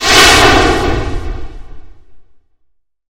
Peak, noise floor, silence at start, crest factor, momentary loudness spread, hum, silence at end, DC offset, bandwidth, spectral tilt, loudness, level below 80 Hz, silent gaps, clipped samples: 0 dBFS; -58 dBFS; 0 s; 12 dB; 22 LU; none; 0.9 s; under 0.1%; over 20 kHz; -2.5 dB/octave; -8 LUFS; -22 dBFS; none; 0.7%